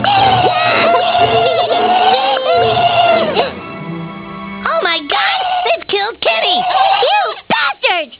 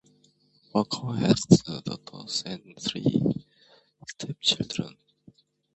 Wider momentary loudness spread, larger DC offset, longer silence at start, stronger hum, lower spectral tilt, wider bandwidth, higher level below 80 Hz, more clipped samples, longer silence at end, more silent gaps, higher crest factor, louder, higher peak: second, 12 LU vs 17 LU; neither; second, 0 s vs 0.75 s; neither; first, -7.5 dB/octave vs -5 dB/octave; second, 4 kHz vs 8.4 kHz; first, -46 dBFS vs -58 dBFS; neither; second, 0.05 s vs 0.85 s; neither; second, 12 dB vs 26 dB; first, -12 LUFS vs -26 LUFS; about the same, 0 dBFS vs -2 dBFS